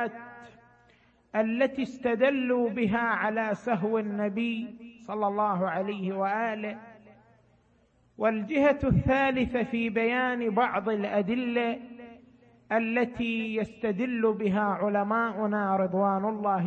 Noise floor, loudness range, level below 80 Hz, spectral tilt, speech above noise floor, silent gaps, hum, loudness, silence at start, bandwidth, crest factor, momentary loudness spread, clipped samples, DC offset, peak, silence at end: -65 dBFS; 4 LU; -54 dBFS; -8 dB/octave; 37 dB; none; none; -28 LUFS; 0 s; 7.4 kHz; 16 dB; 7 LU; under 0.1%; under 0.1%; -12 dBFS; 0 s